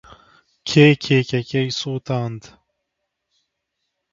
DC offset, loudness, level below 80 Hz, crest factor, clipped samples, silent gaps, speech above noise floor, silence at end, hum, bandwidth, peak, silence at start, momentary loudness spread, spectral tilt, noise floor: under 0.1%; -18 LUFS; -56 dBFS; 22 dB; under 0.1%; none; 60 dB; 1.75 s; none; 7.6 kHz; 0 dBFS; 0.65 s; 16 LU; -6 dB/octave; -78 dBFS